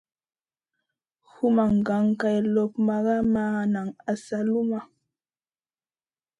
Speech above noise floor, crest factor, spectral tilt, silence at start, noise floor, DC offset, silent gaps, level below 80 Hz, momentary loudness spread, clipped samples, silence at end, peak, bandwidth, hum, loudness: over 66 dB; 16 dB; -8 dB/octave; 1.4 s; under -90 dBFS; under 0.1%; none; -60 dBFS; 7 LU; under 0.1%; 1.55 s; -10 dBFS; 9.8 kHz; none; -25 LUFS